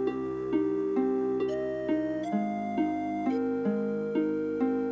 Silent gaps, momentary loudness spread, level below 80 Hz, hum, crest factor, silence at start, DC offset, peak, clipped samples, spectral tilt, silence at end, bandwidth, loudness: none; 2 LU; -62 dBFS; none; 14 dB; 0 s; under 0.1%; -16 dBFS; under 0.1%; -8.5 dB/octave; 0 s; 7.8 kHz; -30 LUFS